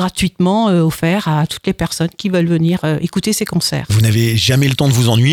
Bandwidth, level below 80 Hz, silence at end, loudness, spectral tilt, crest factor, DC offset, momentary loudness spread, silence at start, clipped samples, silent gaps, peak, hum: 18 kHz; -40 dBFS; 0 s; -15 LUFS; -5.5 dB/octave; 12 dB; under 0.1%; 6 LU; 0 s; under 0.1%; none; -2 dBFS; none